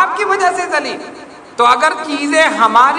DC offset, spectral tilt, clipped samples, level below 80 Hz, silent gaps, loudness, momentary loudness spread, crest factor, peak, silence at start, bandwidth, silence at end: under 0.1%; -2 dB/octave; 0.4%; -58 dBFS; none; -13 LUFS; 16 LU; 14 dB; 0 dBFS; 0 s; 12 kHz; 0 s